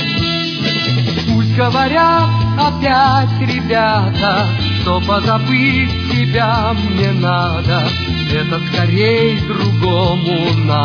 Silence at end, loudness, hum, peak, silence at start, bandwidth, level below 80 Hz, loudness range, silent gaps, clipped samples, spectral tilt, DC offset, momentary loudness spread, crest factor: 0 s; -14 LUFS; none; 0 dBFS; 0 s; 5.4 kHz; -34 dBFS; 2 LU; none; under 0.1%; -7 dB/octave; under 0.1%; 4 LU; 12 dB